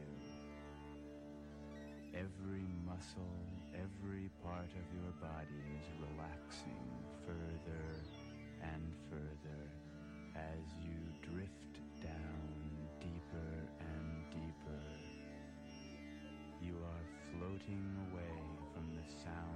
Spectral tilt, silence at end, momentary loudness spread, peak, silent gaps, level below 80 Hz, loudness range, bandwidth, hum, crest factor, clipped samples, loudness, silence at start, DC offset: -7 dB/octave; 0 s; 7 LU; -34 dBFS; none; -58 dBFS; 2 LU; 11 kHz; none; 14 dB; under 0.1%; -50 LUFS; 0 s; under 0.1%